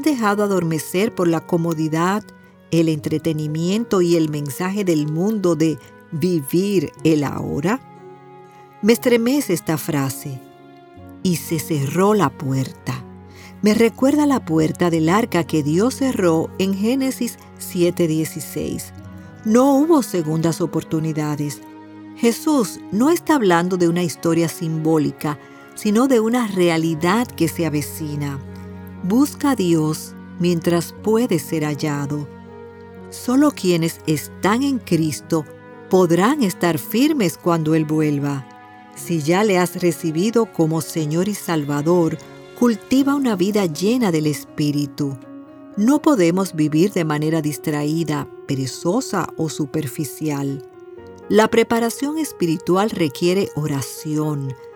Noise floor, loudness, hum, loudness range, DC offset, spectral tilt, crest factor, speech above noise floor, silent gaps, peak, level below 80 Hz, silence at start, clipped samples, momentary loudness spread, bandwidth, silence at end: -44 dBFS; -19 LUFS; none; 3 LU; under 0.1%; -6 dB/octave; 18 dB; 25 dB; none; -2 dBFS; -58 dBFS; 0 s; under 0.1%; 12 LU; 19 kHz; 0 s